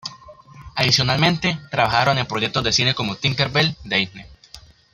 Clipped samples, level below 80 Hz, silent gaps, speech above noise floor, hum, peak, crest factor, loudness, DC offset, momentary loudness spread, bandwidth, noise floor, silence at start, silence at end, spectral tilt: under 0.1%; -48 dBFS; none; 26 dB; none; 0 dBFS; 20 dB; -19 LUFS; under 0.1%; 6 LU; 15 kHz; -46 dBFS; 0.05 s; 0.35 s; -4 dB/octave